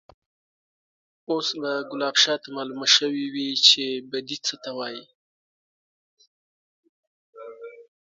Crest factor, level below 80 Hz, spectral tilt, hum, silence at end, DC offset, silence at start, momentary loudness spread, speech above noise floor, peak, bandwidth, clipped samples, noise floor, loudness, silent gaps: 26 dB; -76 dBFS; -1 dB/octave; none; 0.35 s; under 0.1%; 1.3 s; 23 LU; over 66 dB; -2 dBFS; 7.8 kHz; under 0.1%; under -90 dBFS; -22 LUFS; 5.15-6.17 s, 6.27-6.83 s, 6.89-7.33 s